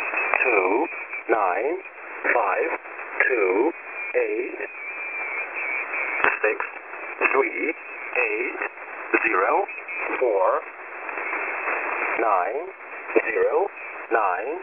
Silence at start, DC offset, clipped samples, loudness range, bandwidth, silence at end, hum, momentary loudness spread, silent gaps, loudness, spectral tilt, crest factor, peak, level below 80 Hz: 0 s; under 0.1%; under 0.1%; 2 LU; 3.6 kHz; 0 s; none; 11 LU; none; -24 LUFS; -7 dB/octave; 24 dB; 0 dBFS; -70 dBFS